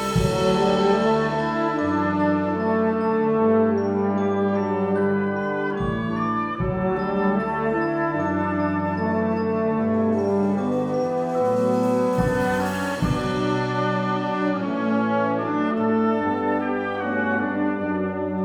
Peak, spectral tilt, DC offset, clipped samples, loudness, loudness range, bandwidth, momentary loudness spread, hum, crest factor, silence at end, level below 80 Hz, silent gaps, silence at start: -8 dBFS; -7 dB/octave; under 0.1%; under 0.1%; -22 LUFS; 2 LU; 16 kHz; 4 LU; none; 14 dB; 0 s; -46 dBFS; none; 0 s